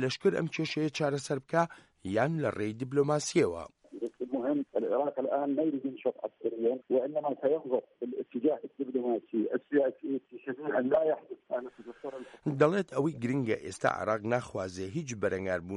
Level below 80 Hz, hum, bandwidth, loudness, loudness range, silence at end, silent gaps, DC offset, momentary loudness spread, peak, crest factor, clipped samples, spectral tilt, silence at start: -70 dBFS; none; 11.5 kHz; -32 LUFS; 1 LU; 0 s; none; under 0.1%; 10 LU; -14 dBFS; 18 dB; under 0.1%; -6 dB/octave; 0 s